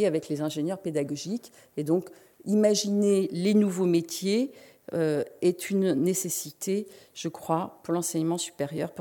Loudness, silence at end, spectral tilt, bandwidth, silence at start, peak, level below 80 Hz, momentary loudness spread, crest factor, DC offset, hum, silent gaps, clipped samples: -28 LUFS; 0 s; -5 dB/octave; 17.5 kHz; 0 s; -10 dBFS; -76 dBFS; 12 LU; 18 dB; under 0.1%; none; none; under 0.1%